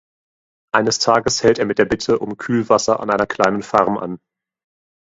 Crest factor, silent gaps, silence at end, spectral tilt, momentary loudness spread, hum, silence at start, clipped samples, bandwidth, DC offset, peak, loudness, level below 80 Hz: 18 dB; none; 0.95 s; -4 dB/octave; 6 LU; none; 0.75 s; under 0.1%; 8 kHz; under 0.1%; 0 dBFS; -17 LUFS; -50 dBFS